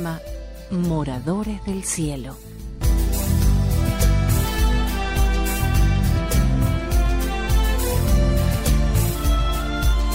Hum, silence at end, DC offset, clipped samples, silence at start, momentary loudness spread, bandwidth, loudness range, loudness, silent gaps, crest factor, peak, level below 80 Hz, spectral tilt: none; 0 s; under 0.1%; under 0.1%; 0 s; 8 LU; 16.5 kHz; 3 LU; -21 LUFS; none; 12 dB; -8 dBFS; -22 dBFS; -5.5 dB/octave